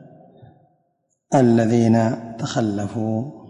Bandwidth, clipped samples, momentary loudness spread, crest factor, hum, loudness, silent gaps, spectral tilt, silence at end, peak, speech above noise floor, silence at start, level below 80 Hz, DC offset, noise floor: 10.5 kHz; under 0.1%; 9 LU; 16 dB; none; -19 LUFS; none; -7 dB/octave; 0.05 s; -6 dBFS; 51 dB; 1.3 s; -56 dBFS; under 0.1%; -70 dBFS